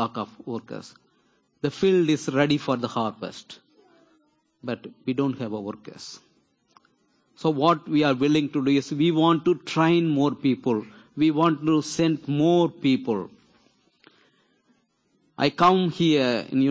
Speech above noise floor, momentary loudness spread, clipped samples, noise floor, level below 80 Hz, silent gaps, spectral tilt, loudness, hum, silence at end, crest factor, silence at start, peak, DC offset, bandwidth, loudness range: 45 dB; 16 LU; under 0.1%; -68 dBFS; -66 dBFS; none; -6.5 dB/octave; -23 LUFS; none; 0 s; 20 dB; 0 s; -6 dBFS; under 0.1%; 8 kHz; 10 LU